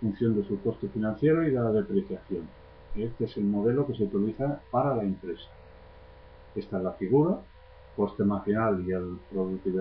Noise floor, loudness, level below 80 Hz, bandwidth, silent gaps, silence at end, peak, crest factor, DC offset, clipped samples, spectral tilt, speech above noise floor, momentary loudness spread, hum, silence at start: -50 dBFS; -29 LUFS; -52 dBFS; 5.2 kHz; none; 0 s; -12 dBFS; 16 dB; under 0.1%; under 0.1%; -12 dB/octave; 22 dB; 12 LU; none; 0 s